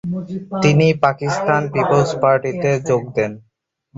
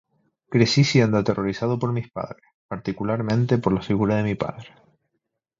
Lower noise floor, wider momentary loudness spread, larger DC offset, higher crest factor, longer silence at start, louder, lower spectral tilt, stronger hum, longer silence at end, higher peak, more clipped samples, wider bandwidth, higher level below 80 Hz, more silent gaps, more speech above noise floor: second, -52 dBFS vs -78 dBFS; second, 10 LU vs 15 LU; neither; about the same, 16 dB vs 20 dB; second, 0.05 s vs 0.5 s; first, -17 LUFS vs -22 LUFS; about the same, -6.5 dB/octave vs -6.5 dB/octave; neither; second, 0.6 s vs 0.95 s; about the same, -2 dBFS vs -4 dBFS; neither; about the same, 7.8 kHz vs 7.6 kHz; about the same, -52 dBFS vs -52 dBFS; second, none vs 2.54-2.69 s; second, 35 dB vs 56 dB